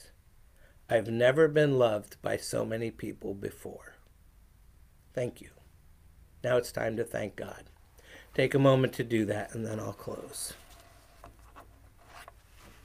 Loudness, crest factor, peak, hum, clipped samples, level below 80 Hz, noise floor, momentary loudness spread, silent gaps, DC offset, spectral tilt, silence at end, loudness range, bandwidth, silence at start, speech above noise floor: -30 LUFS; 20 dB; -12 dBFS; none; under 0.1%; -58 dBFS; -59 dBFS; 21 LU; none; under 0.1%; -6 dB/octave; 0.15 s; 13 LU; 16 kHz; 0.9 s; 29 dB